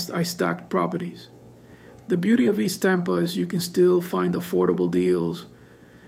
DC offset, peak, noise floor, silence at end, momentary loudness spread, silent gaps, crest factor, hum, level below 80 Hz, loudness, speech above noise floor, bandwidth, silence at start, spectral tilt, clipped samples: under 0.1%; -8 dBFS; -49 dBFS; 0.6 s; 9 LU; none; 16 dB; none; -62 dBFS; -23 LUFS; 27 dB; 16 kHz; 0 s; -6 dB/octave; under 0.1%